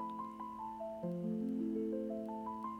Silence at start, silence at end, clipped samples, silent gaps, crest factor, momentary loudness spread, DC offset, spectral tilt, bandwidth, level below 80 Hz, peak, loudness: 0 s; 0 s; under 0.1%; none; 12 dB; 7 LU; under 0.1%; -9.5 dB/octave; 10.5 kHz; -72 dBFS; -30 dBFS; -41 LUFS